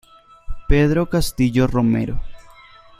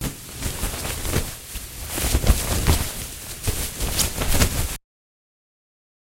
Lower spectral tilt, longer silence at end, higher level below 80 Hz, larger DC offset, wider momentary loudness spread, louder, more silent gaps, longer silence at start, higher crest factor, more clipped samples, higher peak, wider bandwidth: first, -6.5 dB/octave vs -3.5 dB/octave; second, 0.65 s vs 1.25 s; about the same, -28 dBFS vs -28 dBFS; neither; first, 17 LU vs 11 LU; first, -19 LUFS vs -24 LUFS; neither; first, 0.5 s vs 0 s; second, 18 dB vs 24 dB; neither; about the same, -2 dBFS vs 0 dBFS; about the same, 15.5 kHz vs 16 kHz